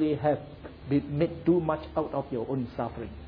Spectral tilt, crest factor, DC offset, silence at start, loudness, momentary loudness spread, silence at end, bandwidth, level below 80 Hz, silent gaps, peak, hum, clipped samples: -11 dB/octave; 16 dB; under 0.1%; 0 s; -29 LUFS; 9 LU; 0 s; 5 kHz; -50 dBFS; none; -12 dBFS; none; under 0.1%